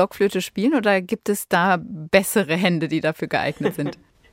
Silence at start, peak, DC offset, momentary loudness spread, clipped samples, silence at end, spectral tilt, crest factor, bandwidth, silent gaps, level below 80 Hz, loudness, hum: 0 s; -2 dBFS; under 0.1%; 6 LU; under 0.1%; 0.4 s; -5 dB/octave; 20 dB; 16 kHz; none; -58 dBFS; -21 LUFS; none